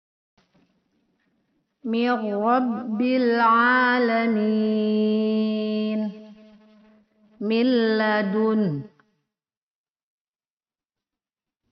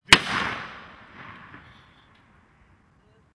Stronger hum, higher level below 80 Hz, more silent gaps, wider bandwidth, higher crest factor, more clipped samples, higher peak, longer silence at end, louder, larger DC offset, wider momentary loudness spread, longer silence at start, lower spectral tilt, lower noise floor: neither; second, -72 dBFS vs -50 dBFS; neither; second, 5.8 kHz vs 11 kHz; second, 16 dB vs 28 dB; neither; second, -8 dBFS vs 0 dBFS; first, 2.85 s vs 1.8 s; about the same, -22 LUFS vs -21 LUFS; neither; second, 9 LU vs 29 LU; first, 1.85 s vs 0.1 s; first, -4 dB/octave vs -1.5 dB/octave; first, under -90 dBFS vs -60 dBFS